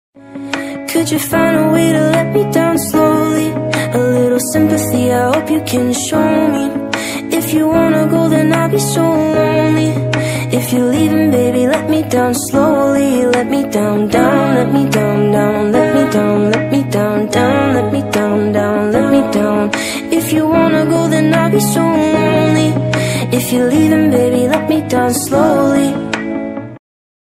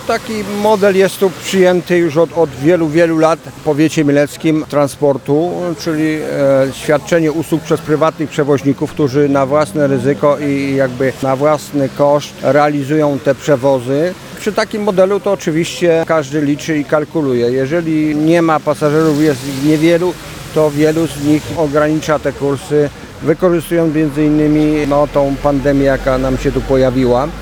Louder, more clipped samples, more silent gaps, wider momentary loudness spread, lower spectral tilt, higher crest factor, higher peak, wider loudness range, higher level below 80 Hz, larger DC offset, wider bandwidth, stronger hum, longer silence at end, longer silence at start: about the same, -13 LUFS vs -13 LUFS; neither; neither; about the same, 5 LU vs 5 LU; about the same, -5.5 dB/octave vs -6.5 dB/octave; about the same, 12 dB vs 12 dB; about the same, 0 dBFS vs 0 dBFS; about the same, 1 LU vs 2 LU; second, -44 dBFS vs -36 dBFS; neither; second, 16 kHz vs 19.5 kHz; neither; first, 0.5 s vs 0 s; first, 0.25 s vs 0 s